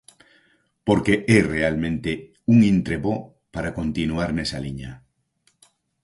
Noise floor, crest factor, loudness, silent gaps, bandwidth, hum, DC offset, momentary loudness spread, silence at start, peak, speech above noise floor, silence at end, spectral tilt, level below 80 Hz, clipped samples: -66 dBFS; 20 dB; -22 LUFS; none; 11.5 kHz; none; under 0.1%; 14 LU; 0.85 s; -2 dBFS; 46 dB; 1.05 s; -6.5 dB/octave; -44 dBFS; under 0.1%